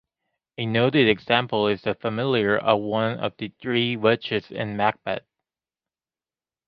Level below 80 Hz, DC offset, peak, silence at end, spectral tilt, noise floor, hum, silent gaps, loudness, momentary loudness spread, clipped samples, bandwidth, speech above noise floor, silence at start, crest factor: -60 dBFS; under 0.1%; -4 dBFS; 1.5 s; -8.5 dB/octave; under -90 dBFS; none; none; -23 LUFS; 11 LU; under 0.1%; 5.8 kHz; over 67 dB; 0.6 s; 20 dB